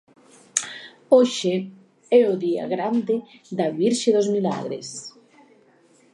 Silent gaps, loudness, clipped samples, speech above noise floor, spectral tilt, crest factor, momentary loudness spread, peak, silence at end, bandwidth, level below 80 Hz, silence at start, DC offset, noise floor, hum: none; -22 LUFS; under 0.1%; 36 dB; -4.5 dB/octave; 24 dB; 17 LU; 0 dBFS; 1.05 s; 11.5 kHz; -76 dBFS; 0.55 s; under 0.1%; -57 dBFS; none